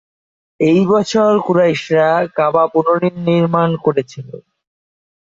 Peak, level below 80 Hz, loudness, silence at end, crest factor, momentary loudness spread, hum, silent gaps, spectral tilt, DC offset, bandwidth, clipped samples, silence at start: -2 dBFS; -58 dBFS; -14 LUFS; 0.95 s; 14 dB; 6 LU; none; none; -7 dB/octave; under 0.1%; 7.8 kHz; under 0.1%; 0.6 s